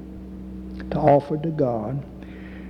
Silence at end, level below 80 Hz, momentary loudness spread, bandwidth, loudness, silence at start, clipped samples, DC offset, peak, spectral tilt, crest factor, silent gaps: 0 s; -42 dBFS; 20 LU; 6.2 kHz; -22 LUFS; 0 s; under 0.1%; under 0.1%; -6 dBFS; -10 dB/octave; 18 dB; none